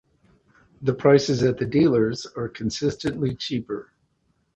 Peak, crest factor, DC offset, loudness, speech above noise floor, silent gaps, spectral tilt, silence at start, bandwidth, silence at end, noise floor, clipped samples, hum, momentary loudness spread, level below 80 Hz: -4 dBFS; 20 dB; under 0.1%; -23 LUFS; 47 dB; none; -6 dB/octave; 0.8 s; 8.4 kHz; 0.75 s; -69 dBFS; under 0.1%; none; 12 LU; -52 dBFS